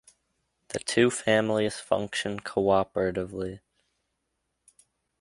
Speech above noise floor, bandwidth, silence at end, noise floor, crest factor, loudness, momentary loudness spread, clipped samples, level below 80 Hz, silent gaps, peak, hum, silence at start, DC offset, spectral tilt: 53 dB; 11.5 kHz; 1.65 s; -79 dBFS; 22 dB; -27 LUFS; 12 LU; under 0.1%; -58 dBFS; none; -6 dBFS; none; 0.7 s; under 0.1%; -4.5 dB/octave